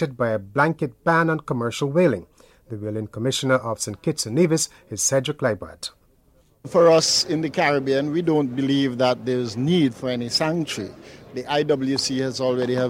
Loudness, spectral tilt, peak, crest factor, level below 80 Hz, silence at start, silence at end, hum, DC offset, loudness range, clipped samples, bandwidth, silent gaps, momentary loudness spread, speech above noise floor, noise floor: -22 LUFS; -4.5 dB/octave; -6 dBFS; 16 dB; -58 dBFS; 0 s; 0 s; none; under 0.1%; 3 LU; under 0.1%; 16 kHz; none; 11 LU; 37 dB; -58 dBFS